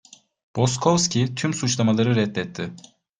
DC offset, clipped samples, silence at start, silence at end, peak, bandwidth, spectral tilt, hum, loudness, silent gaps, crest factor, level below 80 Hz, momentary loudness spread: under 0.1%; under 0.1%; 0.55 s; 0.4 s; -4 dBFS; 10 kHz; -5 dB/octave; none; -22 LUFS; none; 20 dB; -56 dBFS; 13 LU